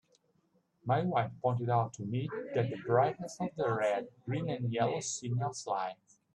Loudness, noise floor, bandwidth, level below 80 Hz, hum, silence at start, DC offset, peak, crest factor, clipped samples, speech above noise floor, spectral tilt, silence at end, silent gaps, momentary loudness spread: -34 LUFS; -73 dBFS; 9.8 kHz; -72 dBFS; none; 0.85 s; under 0.1%; -14 dBFS; 20 dB; under 0.1%; 41 dB; -6 dB/octave; 0.4 s; none; 7 LU